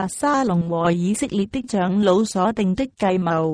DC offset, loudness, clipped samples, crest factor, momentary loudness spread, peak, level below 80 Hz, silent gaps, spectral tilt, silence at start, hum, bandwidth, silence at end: under 0.1%; -20 LUFS; under 0.1%; 16 dB; 5 LU; -4 dBFS; -50 dBFS; none; -6 dB/octave; 0 s; none; 11 kHz; 0 s